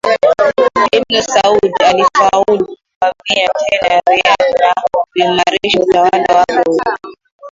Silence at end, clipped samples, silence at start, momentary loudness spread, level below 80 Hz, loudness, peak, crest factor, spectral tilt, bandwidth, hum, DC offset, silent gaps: 0.05 s; under 0.1%; 0.05 s; 6 LU; -48 dBFS; -11 LUFS; 0 dBFS; 12 dB; -3 dB/octave; 7.8 kHz; none; under 0.1%; 2.96-3.01 s, 7.32-7.39 s